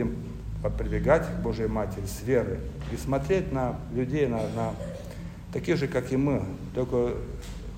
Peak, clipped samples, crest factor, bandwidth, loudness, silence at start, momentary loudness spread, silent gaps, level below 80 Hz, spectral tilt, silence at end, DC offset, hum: -8 dBFS; under 0.1%; 20 dB; 16 kHz; -29 LUFS; 0 s; 11 LU; none; -40 dBFS; -7 dB/octave; 0 s; under 0.1%; none